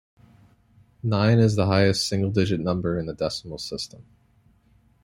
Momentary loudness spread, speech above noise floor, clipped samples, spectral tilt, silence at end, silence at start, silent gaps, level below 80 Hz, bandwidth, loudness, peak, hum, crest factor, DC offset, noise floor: 13 LU; 38 dB; under 0.1%; -6 dB/octave; 1 s; 1.05 s; none; -52 dBFS; 14 kHz; -23 LUFS; -6 dBFS; none; 18 dB; under 0.1%; -60 dBFS